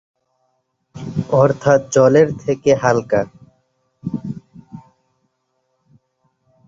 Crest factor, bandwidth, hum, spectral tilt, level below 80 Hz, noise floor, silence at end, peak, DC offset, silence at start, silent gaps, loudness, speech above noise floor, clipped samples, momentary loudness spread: 18 dB; 7.8 kHz; none; -6.5 dB/octave; -54 dBFS; -69 dBFS; 1.9 s; -2 dBFS; under 0.1%; 0.95 s; none; -16 LUFS; 55 dB; under 0.1%; 18 LU